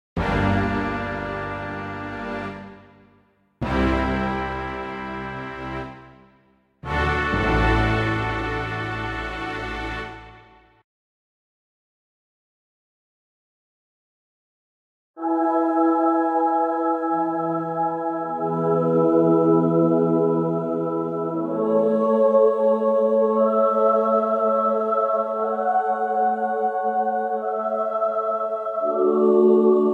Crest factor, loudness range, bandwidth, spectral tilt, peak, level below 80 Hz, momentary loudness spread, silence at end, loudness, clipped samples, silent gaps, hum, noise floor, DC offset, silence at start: 16 dB; 10 LU; 9 kHz; -8 dB/octave; -6 dBFS; -38 dBFS; 13 LU; 0 s; -22 LUFS; under 0.1%; 10.84-15.14 s; none; -60 dBFS; under 0.1%; 0.15 s